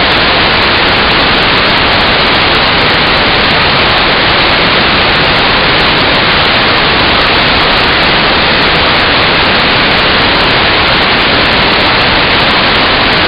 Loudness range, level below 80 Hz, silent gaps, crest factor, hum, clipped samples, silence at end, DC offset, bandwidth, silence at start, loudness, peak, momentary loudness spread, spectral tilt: 0 LU; -24 dBFS; none; 8 dB; none; 0.2%; 0 s; under 0.1%; 17 kHz; 0 s; -6 LUFS; 0 dBFS; 0 LU; -5.5 dB/octave